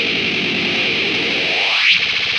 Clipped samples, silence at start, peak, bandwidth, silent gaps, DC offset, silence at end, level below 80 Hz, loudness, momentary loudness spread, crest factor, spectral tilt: under 0.1%; 0 s; -2 dBFS; 11.5 kHz; none; under 0.1%; 0 s; -54 dBFS; -14 LUFS; 5 LU; 14 dB; -2.5 dB/octave